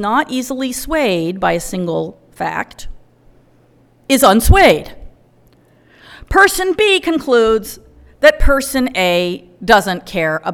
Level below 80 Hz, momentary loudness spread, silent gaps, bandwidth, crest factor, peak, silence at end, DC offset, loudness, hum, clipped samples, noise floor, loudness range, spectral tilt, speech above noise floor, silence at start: -26 dBFS; 12 LU; none; 19.5 kHz; 16 dB; 0 dBFS; 0 s; under 0.1%; -14 LUFS; none; 0.2%; -51 dBFS; 7 LU; -4 dB/octave; 37 dB; 0 s